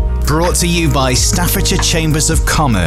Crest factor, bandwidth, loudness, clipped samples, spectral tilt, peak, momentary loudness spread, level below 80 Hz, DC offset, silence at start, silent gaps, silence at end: 10 dB; 16 kHz; -13 LUFS; under 0.1%; -4 dB/octave; -2 dBFS; 1 LU; -18 dBFS; under 0.1%; 0 s; none; 0 s